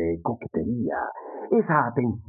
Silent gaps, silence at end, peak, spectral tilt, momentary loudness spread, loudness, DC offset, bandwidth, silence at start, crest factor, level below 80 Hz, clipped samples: none; 0.05 s; -6 dBFS; -13.5 dB/octave; 10 LU; -26 LUFS; under 0.1%; 2.7 kHz; 0 s; 20 dB; -50 dBFS; under 0.1%